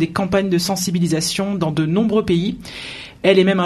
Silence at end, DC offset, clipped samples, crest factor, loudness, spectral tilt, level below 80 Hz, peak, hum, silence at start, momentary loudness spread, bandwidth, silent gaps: 0 s; under 0.1%; under 0.1%; 18 dB; -18 LUFS; -5 dB/octave; -46 dBFS; 0 dBFS; none; 0 s; 13 LU; 13.5 kHz; none